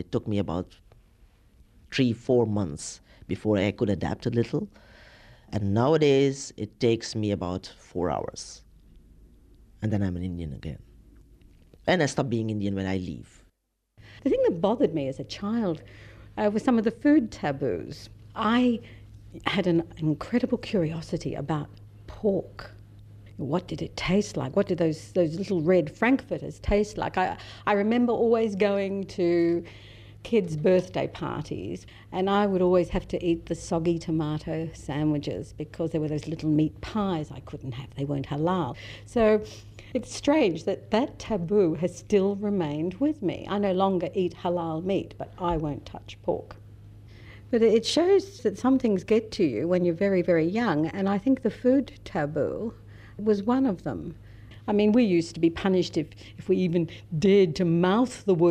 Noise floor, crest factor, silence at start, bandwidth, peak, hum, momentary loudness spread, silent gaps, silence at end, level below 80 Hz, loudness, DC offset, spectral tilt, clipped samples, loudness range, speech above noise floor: -71 dBFS; 18 dB; 0 s; 11.5 kHz; -8 dBFS; none; 14 LU; none; 0 s; -50 dBFS; -26 LUFS; under 0.1%; -6.5 dB/octave; under 0.1%; 6 LU; 45 dB